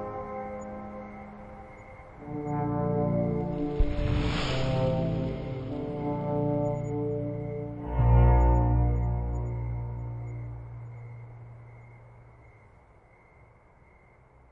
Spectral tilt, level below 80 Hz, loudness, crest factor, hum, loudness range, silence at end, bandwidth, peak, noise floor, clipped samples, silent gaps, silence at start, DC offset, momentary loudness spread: -8.5 dB/octave; -34 dBFS; -29 LUFS; 18 dB; none; 15 LU; 2.05 s; 7.6 kHz; -10 dBFS; -57 dBFS; under 0.1%; none; 0 s; under 0.1%; 21 LU